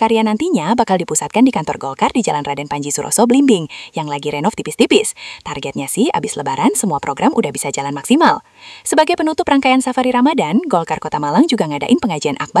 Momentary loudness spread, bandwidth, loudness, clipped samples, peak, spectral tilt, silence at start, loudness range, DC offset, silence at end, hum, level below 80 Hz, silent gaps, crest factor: 9 LU; 12 kHz; -15 LUFS; under 0.1%; 0 dBFS; -4 dB/octave; 0 s; 2 LU; under 0.1%; 0 s; none; -54 dBFS; none; 16 dB